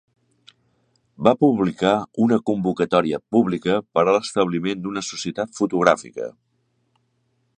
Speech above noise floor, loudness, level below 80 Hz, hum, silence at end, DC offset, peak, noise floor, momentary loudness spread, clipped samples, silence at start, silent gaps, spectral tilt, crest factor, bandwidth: 48 dB; -21 LUFS; -58 dBFS; none; 1.3 s; under 0.1%; 0 dBFS; -68 dBFS; 9 LU; under 0.1%; 1.2 s; none; -5.5 dB/octave; 22 dB; 9.8 kHz